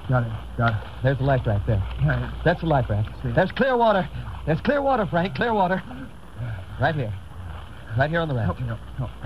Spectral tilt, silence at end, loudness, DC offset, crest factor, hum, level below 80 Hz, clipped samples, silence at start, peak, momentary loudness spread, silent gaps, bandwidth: -8.5 dB/octave; 0 s; -24 LUFS; 0.8%; 18 dB; none; -38 dBFS; under 0.1%; 0 s; -6 dBFS; 13 LU; none; 11.5 kHz